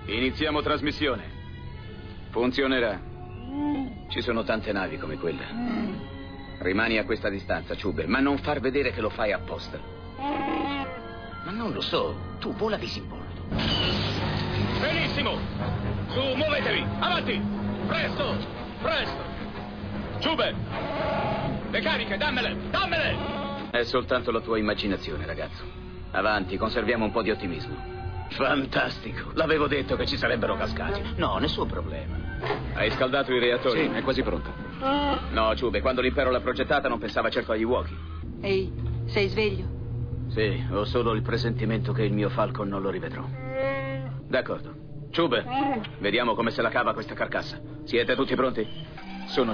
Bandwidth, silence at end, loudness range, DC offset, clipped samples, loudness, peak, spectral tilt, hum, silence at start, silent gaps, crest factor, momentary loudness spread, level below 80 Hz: 5.4 kHz; 0 s; 4 LU; under 0.1%; under 0.1%; -27 LUFS; -10 dBFS; -7 dB/octave; none; 0 s; none; 16 dB; 11 LU; -42 dBFS